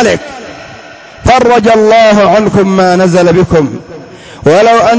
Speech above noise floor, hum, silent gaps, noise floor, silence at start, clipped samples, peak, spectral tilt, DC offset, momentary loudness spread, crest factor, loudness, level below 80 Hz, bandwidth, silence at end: 24 dB; none; none; -30 dBFS; 0 s; 0.3%; 0 dBFS; -6 dB/octave; under 0.1%; 20 LU; 8 dB; -7 LUFS; -32 dBFS; 8 kHz; 0 s